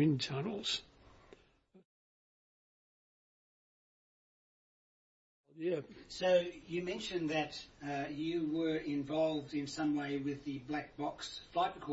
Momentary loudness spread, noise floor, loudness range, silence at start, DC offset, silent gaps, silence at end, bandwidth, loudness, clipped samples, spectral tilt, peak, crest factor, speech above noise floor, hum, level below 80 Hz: 9 LU; -67 dBFS; 10 LU; 0 s; under 0.1%; 1.85-5.44 s; 0 s; 7.6 kHz; -37 LUFS; under 0.1%; -4.5 dB/octave; -20 dBFS; 20 dB; 30 dB; none; -70 dBFS